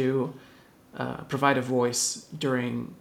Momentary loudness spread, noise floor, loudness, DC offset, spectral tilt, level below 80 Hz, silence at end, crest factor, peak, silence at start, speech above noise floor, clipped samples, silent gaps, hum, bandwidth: 11 LU; -54 dBFS; -27 LUFS; under 0.1%; -4 dB/octave; -66 dBFS; 0.05 s; 20 dB; -8 dBFS; 0 s; 26 dB; under 0.1%; none; none; 18.5 kHz